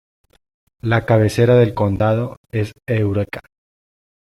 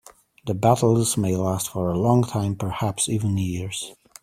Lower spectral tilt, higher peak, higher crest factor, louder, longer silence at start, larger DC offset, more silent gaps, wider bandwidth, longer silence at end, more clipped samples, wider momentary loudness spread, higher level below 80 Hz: first, -7.5 dB/octave vs -5.5 dB/octave; about the same, -2 dBFS vs -2 dBFS; about the same, 16 dB vs 20 dB; first, -18 LUFS vs -23 LUFS; first, 0.85 s vs 0.45 s; neither; first, 2.37-2.44 s vs none; second, 12.5 kHz vs 16 kHz; first, 0.8 s vs 0.3 s; neither; about the same, 12 LU vs 11 LU; about the same, -48 dBFS vs -52 dBFS